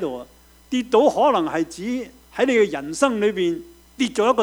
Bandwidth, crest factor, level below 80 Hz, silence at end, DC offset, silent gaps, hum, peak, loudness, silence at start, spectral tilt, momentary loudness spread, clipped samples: over 20 kHz; 18 dB; -56 dBFS; 0 s; under 0.1%; none; none; -2 dBFS; -21 LUFS; 0 s; -4.5 dB/octave; 12 LU; under 0.1%